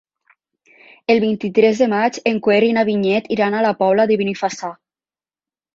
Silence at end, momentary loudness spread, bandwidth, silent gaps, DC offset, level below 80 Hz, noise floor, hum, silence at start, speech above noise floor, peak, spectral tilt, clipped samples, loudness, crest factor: 1 s; 8 LU; 7.6 kHz; none; under 0.1%; -62 dBFS; under -90 dBFS; none; 1.1 s; over 74 dB; -2 dBFS; -5.5 dB/octave; under 0.1%; -17 LUFS; 16 dB